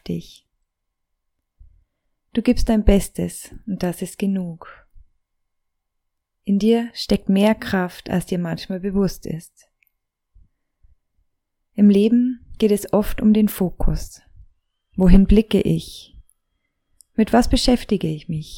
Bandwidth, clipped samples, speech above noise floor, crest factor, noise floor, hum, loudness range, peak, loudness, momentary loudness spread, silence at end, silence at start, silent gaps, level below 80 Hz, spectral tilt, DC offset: 17 kHz; under 0.1%; 58 dB; 20 dB; -76 dBFS; none; 8 LU; -2 dBFS; -20 LUFS; 16 LU; 0 s; 0.05 s; none; -28 dBFS; -6.5 dB/octave; under 0.1%